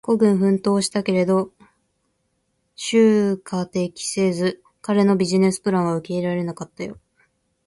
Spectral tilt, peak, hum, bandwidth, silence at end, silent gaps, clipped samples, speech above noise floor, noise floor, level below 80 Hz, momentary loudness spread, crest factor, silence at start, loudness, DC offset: -6 dB/octave; -6 dBFS; none; 11.5 kHz; 0.75 s; none; under 0.1%; 51 dB; -70 dBFS; -62 dBFS; 14 LU; 16 dB; 0.05 s; -20 LUFS; under 0.1%